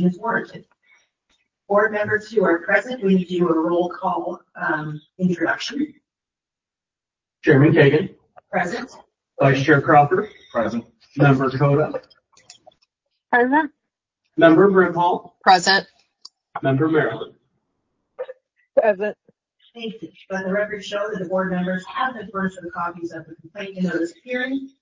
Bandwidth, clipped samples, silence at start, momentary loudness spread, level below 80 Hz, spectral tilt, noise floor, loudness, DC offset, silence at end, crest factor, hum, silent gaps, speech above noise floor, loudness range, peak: 7.6 kHz; under 0.1%; 0 s; 18 LU; -60 dBFS; -6.5 dB/octave; -89 dBFS; -20 LUFS; under 0.1%; 0.15 s; 20 dB; none; none; 69 dB; 8 LU; 0 dBFS